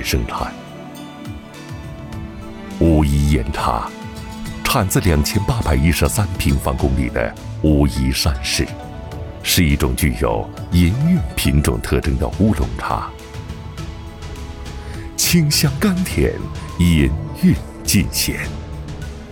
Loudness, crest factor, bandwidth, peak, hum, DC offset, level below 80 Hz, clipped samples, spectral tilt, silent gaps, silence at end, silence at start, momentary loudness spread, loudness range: -18 LUFS; 16 dB; over 20 kHz; -4 dBFS; none; under 0.1%; -26 dBFS; under 0.1%; -5 dB/octave; none; 0 s; 0 s; 16 LU; 4 LU